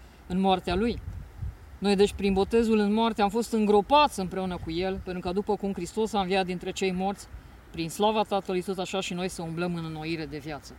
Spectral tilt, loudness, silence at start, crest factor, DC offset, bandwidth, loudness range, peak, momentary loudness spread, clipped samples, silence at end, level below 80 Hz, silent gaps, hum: -5.5 dB/octave; -27 LUFS; 0 s; 18 dB; under 0.1%; 16.5 kHz; 6 LU; -10 dBFS; 13 LU; under 0.1%; 0 s; -46 dBFS; none; none